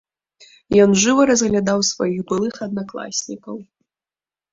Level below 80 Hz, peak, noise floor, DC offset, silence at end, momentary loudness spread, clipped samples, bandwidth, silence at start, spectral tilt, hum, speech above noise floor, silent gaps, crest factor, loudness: -52 dBFS; -2 dBFS; under -90 dBFS; under 0.1%; 0.9 s; 17 LU; under 0.1%; 7.8 kHz; 0.7 s; -4 dB/octave; none; over 72 dB; none; 18 dB; -18 LUFS